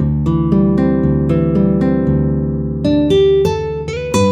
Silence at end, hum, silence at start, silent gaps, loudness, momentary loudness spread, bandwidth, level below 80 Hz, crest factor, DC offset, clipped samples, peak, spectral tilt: 0 s; none; 0 s; none; -14 LUFS; 6 LU; 11.5 kHz; -28 dBFS; 12 dB; under 0.1%; under 0.1%; -2 dBFS; -7.5 dB/octave